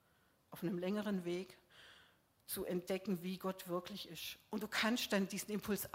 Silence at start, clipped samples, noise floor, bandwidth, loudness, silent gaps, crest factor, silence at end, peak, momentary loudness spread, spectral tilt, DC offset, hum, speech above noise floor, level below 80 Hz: 0.5 s; under 0.1%; -74 dBFS; 16 kHz; -41 LUFS; none; 20 dB; 0 s; -22 dBFS; 21 LU; -4.5 dB/octave; under 0.1%; none; 33 dB; -74 dBFS